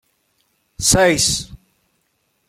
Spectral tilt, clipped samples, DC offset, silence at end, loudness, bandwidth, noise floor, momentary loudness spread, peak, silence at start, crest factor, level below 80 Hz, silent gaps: -2.5 dB/octave; under 0.1%; under 0.1%; 0.95 s; -15 LUFS; 16.5 kHz; -67 dBFS; 12 LU; -2 dBFS; 0.8 s; 20 dB; -38 dBFS; none